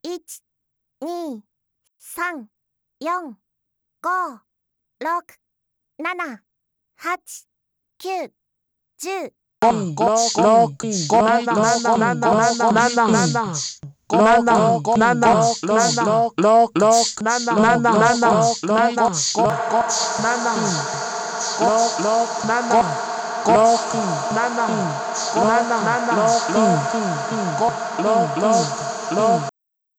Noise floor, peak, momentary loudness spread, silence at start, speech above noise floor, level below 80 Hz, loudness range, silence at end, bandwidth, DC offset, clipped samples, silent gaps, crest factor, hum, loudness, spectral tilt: -77 dBFS; -6 dBFS; 14 LU; 0.05 s; 59 dB; -58 dBFS; 14 LU; 0.5 s; 15 kHz; under 0.1%; under 0.1%; none; 14 dB; none; -18 LUFS; -4 dB/octave